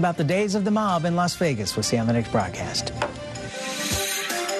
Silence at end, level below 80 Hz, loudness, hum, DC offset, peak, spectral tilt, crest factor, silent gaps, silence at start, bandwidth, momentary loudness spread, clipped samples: 0 s; -48 dBFS; -24 LUFS; none; under 0.1%; -10 dBFS; -4.5 dB/octave; 14 dB; none; 0 s; 13 kHz; 8 LU; under 0.1%